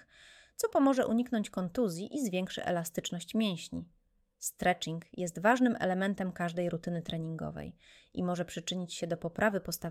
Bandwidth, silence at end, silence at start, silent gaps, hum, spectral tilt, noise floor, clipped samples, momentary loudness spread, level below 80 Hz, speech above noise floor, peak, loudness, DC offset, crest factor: 16.5 kHz; 0 s; 0.3 s; none; none; -5 dB/octave; -59 dBFS; under 0.1%; 12 LU; -62 dBFS; 26 dB; -12 dBFS; -33 LUFS; under 0.1%; 20 dB